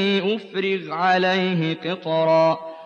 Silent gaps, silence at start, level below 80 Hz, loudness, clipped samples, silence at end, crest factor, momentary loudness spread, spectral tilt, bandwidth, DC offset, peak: none; 0 s; -76 dBFS; -21 LUFS; under 0.1%; 0 s; 14 dB; 7 LU; -6.5 dB/octave; 7.2 kHz; under 0.1%; -6 dBFS